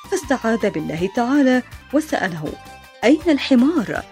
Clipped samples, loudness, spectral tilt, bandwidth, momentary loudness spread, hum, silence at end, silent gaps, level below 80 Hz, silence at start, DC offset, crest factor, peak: under 0.1%; -19 LUFS; -5 dB/octave; 15.5 kHz; 8 LU; none; 0.05 s; none; -46 dBFS; 0 s; under 0.1%; 18 dB; 0 dBFS